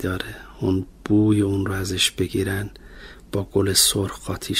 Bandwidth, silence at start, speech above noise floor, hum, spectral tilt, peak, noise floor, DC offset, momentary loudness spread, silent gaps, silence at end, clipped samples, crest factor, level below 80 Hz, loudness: 16 kHz; 0 s; 20 dB; none; -4 dB/octave; -4 dBFS; -42 dBFS; under 0.1%; 14 LU; none; 0 s; under 0.1%; 18 dB; -44 dBFS; -21 LUFS